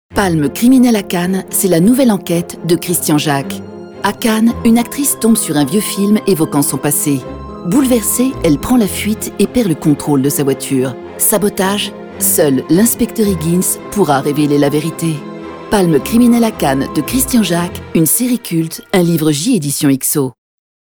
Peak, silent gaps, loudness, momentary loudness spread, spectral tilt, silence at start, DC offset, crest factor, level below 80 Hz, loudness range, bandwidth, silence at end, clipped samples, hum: 0 dBFS; none; -13 LUFS; 7 LU; -4.5 dB/octave; 0.1 s; under 0.1%; 12 dB; -38 dBFS; 1 LU; over 20 kHz; 0.55 s; under 0.1%; none